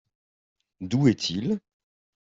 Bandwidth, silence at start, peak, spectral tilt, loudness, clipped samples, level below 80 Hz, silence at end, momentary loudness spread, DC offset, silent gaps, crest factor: 7.8 kHz; 0.8 s; -8 dBFS; -6 dB/octave; -25 LUFS; under 0.1%; -64 dBFS; 0.75 s; 10 LU; under 0.1%; none; 22 dB